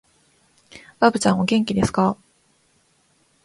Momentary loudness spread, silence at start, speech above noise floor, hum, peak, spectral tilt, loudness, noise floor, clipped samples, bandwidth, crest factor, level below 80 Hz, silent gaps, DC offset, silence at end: 5 LU; 0.75 s; 44 dB; none; 0 dBFS; -5.5 dB/octave; -20 LUFS; -62 dBFS; under 0.1%; 11.5 kHz; 22 dB; -50 dBFS; none; under 0.1%; 1.3 s